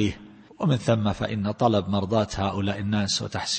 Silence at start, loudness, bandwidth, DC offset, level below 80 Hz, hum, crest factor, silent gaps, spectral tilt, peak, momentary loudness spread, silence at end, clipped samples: 0 s; -25 LUFS; 8.8 kHz; under 0.1%; -50 dBFS; none; 18 dB; none; -5.5 dB/octave; -6 dBFS; 5 LU; 0 s; under 0.1%